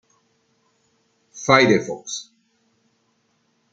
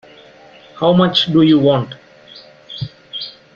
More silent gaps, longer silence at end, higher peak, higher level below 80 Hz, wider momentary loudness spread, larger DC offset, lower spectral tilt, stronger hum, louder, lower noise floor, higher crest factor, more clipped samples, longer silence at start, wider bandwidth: neither; first, 1.5 s vs 0.25 s; about the same, -2 dBFS vs -2 dBFS; second, -64 dBFS vs -54 dBFS; about the same, 17 LU vs 18 LU; neither; second, -4 dB/octave vs -7.5 dB/octave; neither; second, -19 LUFS vs -13 LUFS; first, -67 dBFS vs -43 dBFS; first, 24 dB vs 16 dB; neither; first, 1.35 s vs 0.75 s; first, 9.2 kHz vs 7 kHz